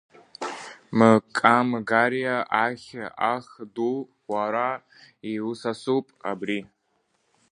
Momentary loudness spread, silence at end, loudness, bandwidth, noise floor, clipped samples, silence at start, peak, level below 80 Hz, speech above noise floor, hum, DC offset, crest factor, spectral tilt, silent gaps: 16 LU; 0.85 s; -24 LUFS; 10.5 kHz; -71 dBFS; under 0.1%; 0.4 s; 0 dBFS; -70 dBFS; 47 dB; none; under 0.1%; 24 dB; -6 dB/octave; none